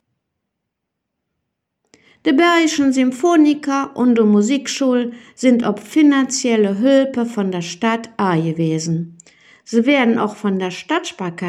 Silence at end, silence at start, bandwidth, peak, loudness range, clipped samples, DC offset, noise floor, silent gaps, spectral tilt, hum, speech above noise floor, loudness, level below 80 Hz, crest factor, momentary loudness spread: 0 s; 2.25 s; 13 kHz; -2 dBFS; 4 LU; under 0.1%; under 0.1%; -78 dBFS; none; -5 dB/octave; none; 62 dB; -16 LUFS; -68 dBFS; 16 dB; 8 LU